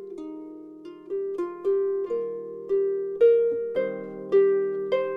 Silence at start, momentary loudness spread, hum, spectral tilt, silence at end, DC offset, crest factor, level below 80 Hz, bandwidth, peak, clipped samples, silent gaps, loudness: 0 s; 19 LU; none; -7.5 dB/octave; 0 s; under 0.1%; 16 dB; -72 dBFS; 5 kHz; -10 dBFS; under 0.1%; none; -25 LUFS